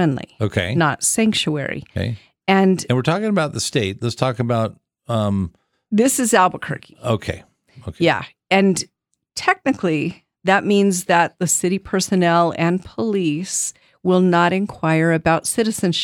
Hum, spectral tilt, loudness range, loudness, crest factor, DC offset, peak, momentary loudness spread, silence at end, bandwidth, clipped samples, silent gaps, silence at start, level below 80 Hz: none; -4.5 dB/octave; 3 LU; -19 LUFS; 18 dB; under 0.1%; 0 dBFS; 10 LU; 0 s; 18.5 kHz; under 0.1%; none; 0 s; -52 dBFS